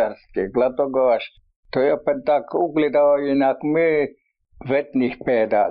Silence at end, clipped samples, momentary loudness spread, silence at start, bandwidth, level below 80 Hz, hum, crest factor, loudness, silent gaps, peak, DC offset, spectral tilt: 0 s; under 0.1%; 7 LU; 0 s; 5.2 kHz; -54 dBFS; none; 12 dB; -20 LUFS; 1.56-1.63 s; -8 dBFS; under 0.1%; -5 dB/octave